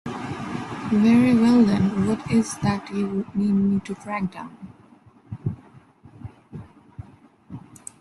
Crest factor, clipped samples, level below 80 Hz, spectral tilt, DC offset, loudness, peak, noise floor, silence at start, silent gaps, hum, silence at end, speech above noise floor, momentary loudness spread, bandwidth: 16 dB; under 0.1%; -54 dBFS; -7 dB/octave; under 0.1%; -22 LUFS; -6 dBFS; -52 dBFS; 0.05 s; none; none; 0.4 s; 32 dB; 26 LU; 12 kHz